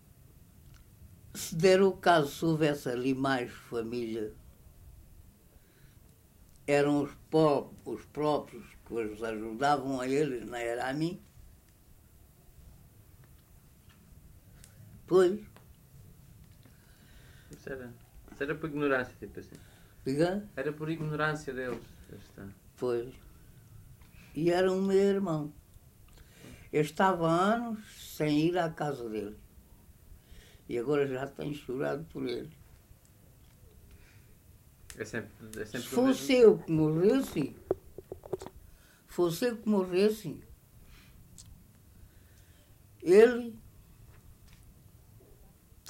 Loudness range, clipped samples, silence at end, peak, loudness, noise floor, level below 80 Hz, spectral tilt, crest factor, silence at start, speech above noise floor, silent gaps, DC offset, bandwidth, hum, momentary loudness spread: 11 LU; under 0.1%; 0 s; -10 dBFS; -30 LUFS; -60 dBFS; -60 dBFS; -6 dB/octave; 22 dB; 0.7 s; 30 dB; none; under 0.1%; 16 kHz; none; 20 LU